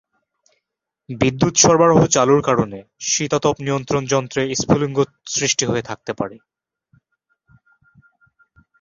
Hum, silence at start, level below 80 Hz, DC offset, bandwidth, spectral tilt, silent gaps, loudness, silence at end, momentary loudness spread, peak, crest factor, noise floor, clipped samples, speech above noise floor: none; 1.1 s; -50 dBFS; under 0.1%; 7.6 kHz; -4 dB/octave; none; -18 LUFS; 2.45 s; 14 LU; 0 dBFS; 20 dB; -80 dBFS; under 0.1%; 63 dB